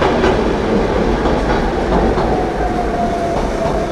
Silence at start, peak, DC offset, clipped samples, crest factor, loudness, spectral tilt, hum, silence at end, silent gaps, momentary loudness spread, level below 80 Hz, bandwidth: 0 s; 0 dBFS; under 0.1%; under 0.1%; 14 dB; -16 LUFS; -6.5 dB/octave; none; 0 s; none; 3 LU; -24 dBFS; 12 kHz